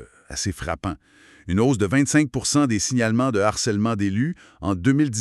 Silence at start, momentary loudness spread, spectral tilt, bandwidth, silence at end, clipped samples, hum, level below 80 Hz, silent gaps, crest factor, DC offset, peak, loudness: 0 s; 9 LU; -5 dB/octave; 12.5 kHz; 0 s; under 0.1%; none; -46 dBFS; none; 18 dB; under 0.1%; -2 dBFS; -22 LUFS